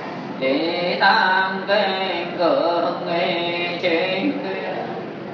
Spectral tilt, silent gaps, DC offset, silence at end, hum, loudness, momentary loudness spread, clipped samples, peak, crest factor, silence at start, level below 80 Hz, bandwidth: -6 dB/octave; none; under 0.1%; 0 s; none; -20 LUFS; 10 LU; under 0.1%; -4 dBFS; 18 dB; 0 s; -72 dBFS; 6.6 kHz